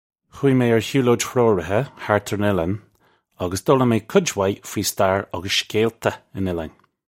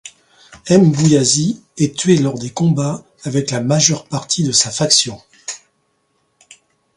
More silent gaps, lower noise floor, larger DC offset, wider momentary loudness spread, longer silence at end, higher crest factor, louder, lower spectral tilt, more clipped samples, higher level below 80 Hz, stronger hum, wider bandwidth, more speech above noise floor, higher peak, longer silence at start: neither; about the same, -61 dBFS vs -64 dBFS; neither; second, 9 LU vs 17 LU; second, 0.45 s vs 1.4 s; about the same, 20 dB vs 16 dB; second, -21 LUFS vs -15 LUFS; about the same, -5 dB/octave vs -4 dB/octave; neither; about the same, -52 dBFS vs -54 dBFS; neither; first, 16.5 kHz vs 11.5 kHz; second, 41 dB vs 50 dB; about the same, -2 dBFS vs 0 dBFS; first, 0.35 s vs 0.05 s